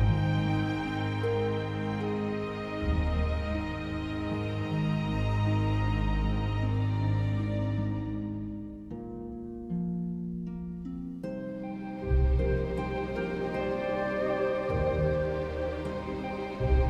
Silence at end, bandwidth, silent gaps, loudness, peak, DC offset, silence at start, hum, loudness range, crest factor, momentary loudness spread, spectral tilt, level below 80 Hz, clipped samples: 0 s; 8 kHz; none; -31 LUFS; -16 dBFS; under 0.1%; 0 s; none; 6 LU; 14 dB; 10 LU; -8.5 dB/octave; -36 dBFS; under 0.1%